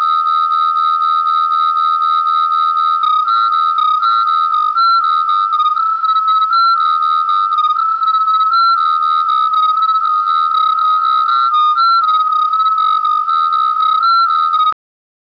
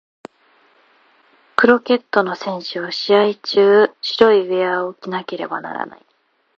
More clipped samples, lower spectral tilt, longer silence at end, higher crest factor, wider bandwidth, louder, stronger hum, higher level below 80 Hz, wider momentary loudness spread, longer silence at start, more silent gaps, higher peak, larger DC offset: neither; second, 0 dB/octave vs -5.5 dB/octave; about the same, 0.6 s vs 0.65 s; second, 4 dB vs 18 dB; second, 5.4 kHz vs 7 kHz; first, -12 LUFS vs -17 LUFS; neither; second, -68 dBFS vs -62 dBFS; second, 2 LU vs 12 LU; second, 0 s vs 1.6 s; neither; second, -8 dBFS vs 0 dBFS; neither